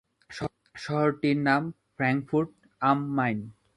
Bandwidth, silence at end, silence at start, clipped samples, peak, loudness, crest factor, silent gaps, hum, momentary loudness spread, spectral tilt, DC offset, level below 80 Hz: 11 kHz; 0.25 s; 0.3 s; under 0.1%; -8 dBFS; -28 LUFS; 20 dB; none; none; 12 LU; -7.5 dB/octave; under 0.1%; -62 dBFS